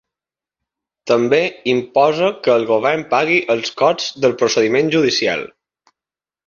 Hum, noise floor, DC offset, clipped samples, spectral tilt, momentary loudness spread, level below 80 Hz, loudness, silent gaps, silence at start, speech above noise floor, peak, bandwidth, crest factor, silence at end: none; -90 dBFS; under 0.1%; under 0.1%; -4 dB/octave; 5 LU; -60 dBFS; -16 LUFS; none; 1.05 s; 74 dB; -2 dBFS; 7.4 kHz; 16 dB; 1 s